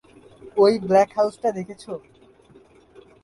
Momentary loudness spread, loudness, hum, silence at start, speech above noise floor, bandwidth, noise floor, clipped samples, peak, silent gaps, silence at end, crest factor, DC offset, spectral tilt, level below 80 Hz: 18 LU; -20 LUFS; none; 0.45 s; 32 dB; 11.5 kHz; -52 dBFS; under 0.1%; -6 dBFS; none; 1.25 s; 18 dB; under 0.1%; -6 dB/octave; -62 dBFS